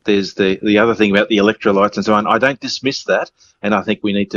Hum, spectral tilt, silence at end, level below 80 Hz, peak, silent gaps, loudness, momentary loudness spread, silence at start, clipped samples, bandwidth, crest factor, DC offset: none; -5.5 dB/octave; 0 s; -54 dBFS; 0 dBFS; none; -15 LUFS; 6 LU; 0.05 s; under 0.1%; 7.4 kHz; 16 dB; under 0.1%